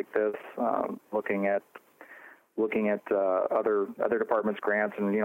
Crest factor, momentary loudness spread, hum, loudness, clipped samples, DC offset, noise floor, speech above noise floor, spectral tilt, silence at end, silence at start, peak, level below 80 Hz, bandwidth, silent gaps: 16 dB; 6 LU; none; -29 LUFS; under 0.1%; under 0.1%; -52 dBFS; 24 dB; -8.5 dB/octave; 0 s; 0 s; -12 dBFS; -76 dBFS; 16 kHz; none